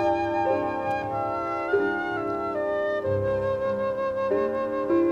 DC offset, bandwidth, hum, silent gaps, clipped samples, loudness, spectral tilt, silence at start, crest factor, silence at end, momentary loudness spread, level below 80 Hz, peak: under 0.1%; 7.8 kHz; none; none; under 0.1%; -26 LUFS; -8 dB/octave; 0 s; 14 dB; 0 s; 3 LU; -54 dBFS; -12 dBFS